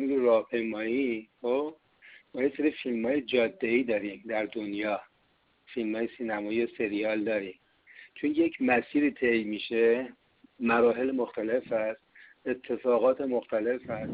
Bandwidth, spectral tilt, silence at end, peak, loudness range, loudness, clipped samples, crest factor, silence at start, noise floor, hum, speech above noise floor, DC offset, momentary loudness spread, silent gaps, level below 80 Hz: 5 kHz; -3.5 dB/octave; 0 s; -12 dBFS; 5 LU; -29 LUFS; under 0.1%; 16 dB; 0 s; -69 dBFS; none; 41 dB; under 0.1%; 10 LU; none; -68 dBFS